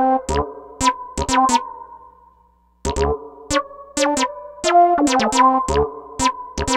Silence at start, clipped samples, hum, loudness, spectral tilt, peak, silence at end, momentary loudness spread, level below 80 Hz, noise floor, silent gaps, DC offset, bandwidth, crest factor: 0 s; under 0.1%; none; -19 LUFS; -3.5 dB/octave; -2 dBFS; 0 s; 12 LU; -36 dBFS; -56 dBFS; none; under 0.1%; 16.5 kHz; 16 dB